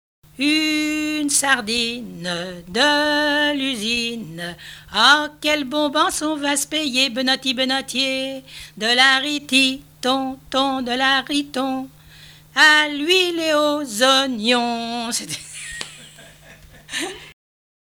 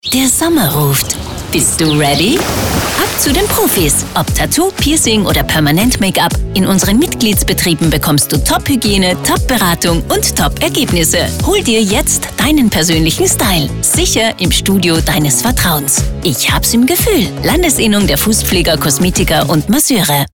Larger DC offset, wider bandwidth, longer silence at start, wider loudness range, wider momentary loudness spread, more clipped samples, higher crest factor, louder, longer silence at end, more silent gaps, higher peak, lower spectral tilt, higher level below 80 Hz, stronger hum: second, under 0.1% vs 0.2%; about the same, over 20 kHz vs 19.5 kHz; first, 0.4 s vs 0.05 s; first, 4 LU vs 1 LU; first, 15 LU vs 3 LU; neither; first, 20 dB vs 10 dB; second, -18 LUFS vs -11 LUFS; first, 0.65 s vs 0.05 s; neither; about the same, 0 dBFS vs -2 dBFS; second, -1.5 dB/octave vs -3.5 dB/octave; second, -54 dBFS vs -24 dBFS; neither